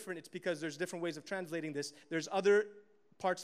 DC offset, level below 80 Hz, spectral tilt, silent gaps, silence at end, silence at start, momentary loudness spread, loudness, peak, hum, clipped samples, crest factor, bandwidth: under 0.1%; -88 dBFS; -4.5 dB/octave; none; 0 s; 0 s; 12 LU; -37 LUFS; -20 dBFS; none; under 0.1%; 18 dB; 14.5 kHz